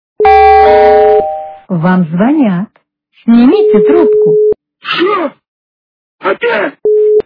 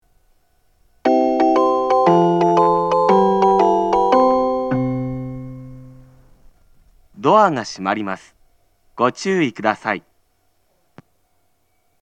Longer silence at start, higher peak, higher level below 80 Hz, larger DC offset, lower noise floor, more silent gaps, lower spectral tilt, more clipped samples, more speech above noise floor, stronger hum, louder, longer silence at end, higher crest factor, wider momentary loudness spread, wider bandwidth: second, 0.2 s vs 1.05 s; about the same, 0 dBFS vs 0 dBFS; first, -38 dBFS vs -50 dBFS; neither; first, under -90 dBFS vs -66 dBFS; first, 5.48-6.19 s vs none; first, -9 dB/octave vs -6.5 dB/octave; first, 0.5% vs under 0.1%; first, over 82 dB vs 47 dB; neither; first, -8 LUFS vs -17 LUFS; second, 0.05 s vs 2.05 s; second, 8 dB vs 18 dB; about the same, 14 LU vs 14 LU; second, 5.4 kHz vs 9.2 kHz